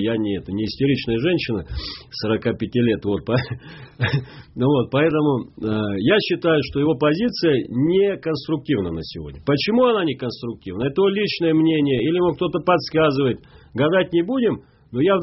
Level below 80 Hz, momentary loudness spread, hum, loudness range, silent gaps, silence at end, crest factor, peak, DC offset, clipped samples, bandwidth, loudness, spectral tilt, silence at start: -46 dBFS; 11 LU; none; 3 LU; none; 0 s; 16 dB; -4 dBFS; under 0.1%; under 0.1%; 6 kHz; -21 LUFS; -5 dB/octave; 0 s